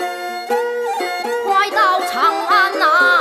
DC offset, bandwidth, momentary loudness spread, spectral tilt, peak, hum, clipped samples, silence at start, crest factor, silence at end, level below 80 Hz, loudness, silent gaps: under 0.1%; 15.5 kHz; 8 LU; -0.5 dB/octave; -2 dBFS; none; under 0.1%; 0 s; 14 dB; 0 s; -70 dBFS; -16 LUFS; none